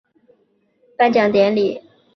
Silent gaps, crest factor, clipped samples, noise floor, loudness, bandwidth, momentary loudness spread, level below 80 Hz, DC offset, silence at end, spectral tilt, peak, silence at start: none; 18 dB; under 0.1%; -62 dBFS; -16 LUFS; 6.2 kHz; 8 LU; -62 dBFS; under 0.1%; 0.35 s; -6.5 dB/octave; -2 dBFS; 1 s